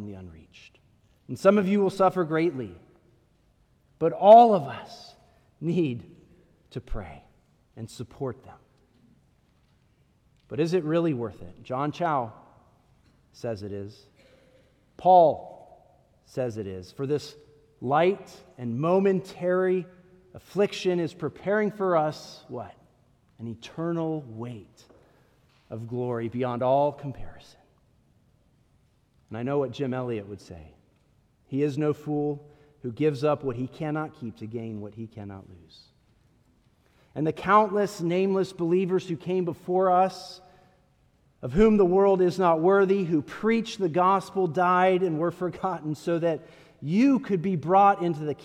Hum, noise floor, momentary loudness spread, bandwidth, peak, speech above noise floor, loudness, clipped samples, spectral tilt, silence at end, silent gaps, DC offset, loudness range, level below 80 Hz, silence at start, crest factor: none; -64 dBFS; 19 LU; 12.5 kHz; -4 dBFS; 40 dB; -25 LUFS; under 0.1%; -7.5 dB/octave; 0.1 s; none; under 0.1%; 13 LU; -54 dBFS; 0 s; 22 dB